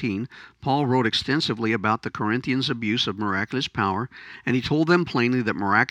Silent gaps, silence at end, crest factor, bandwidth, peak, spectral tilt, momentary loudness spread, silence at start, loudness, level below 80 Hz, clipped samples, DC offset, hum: none; 0.05 s; 20 dB; 10.5 kHz; -4 dBFS; -5.5 dB/octave; 9 LU; 0 s; -23 LUFS; -58 dBFS; under 0.1%; under 0.1%; none